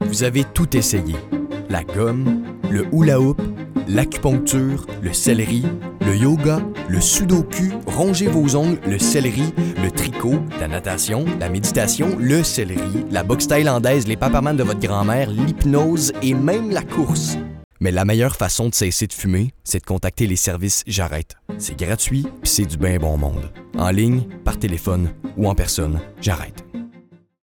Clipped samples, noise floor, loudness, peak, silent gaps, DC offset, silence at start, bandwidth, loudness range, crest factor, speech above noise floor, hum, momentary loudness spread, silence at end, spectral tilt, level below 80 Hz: under 0.1%; -48 dBFS; -19 LUFS; -4 dBFS; 17.64-17.71 s; under 0.1%; 0 s; 19 kHz; 3 LU; 16 dB; 30 dB; none; 9 LU; 0.45 s; -5 dB/octave; -34 dBFS